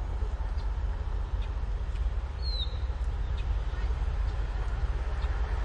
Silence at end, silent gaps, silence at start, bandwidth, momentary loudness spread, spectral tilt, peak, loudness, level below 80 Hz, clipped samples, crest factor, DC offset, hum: 0 s; none; 0 s; 7 kHz; 2 LU; -6.5 dB/octave; -18 dBFS; -34 LUFS; -30 dBFS; under 0.1%; 12 dB; under 0.1%; none